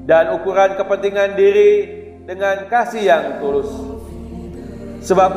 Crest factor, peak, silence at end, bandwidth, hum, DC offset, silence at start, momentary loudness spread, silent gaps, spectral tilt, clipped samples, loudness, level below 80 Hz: 16 dB; 0 dBFS; 0 s; 11.5 kHz; none; under 0.1%; 0 s; 19 LU; none; -5.5 dB/octave; under 0.1%; -16 LUFS; -42 dBFS